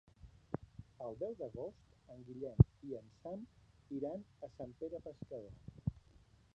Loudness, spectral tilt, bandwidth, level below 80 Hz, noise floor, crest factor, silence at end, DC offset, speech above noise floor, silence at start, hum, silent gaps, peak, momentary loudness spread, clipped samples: -41 LUFS; -11 dB/octave; 6.2 kHz; -54 dBFS; -66 dBFS; 32 dB; 0.55 s; under 0.1%; 27 dB; 0.25 s; none; none; -10 dBFS; 22 LU; under 0.1%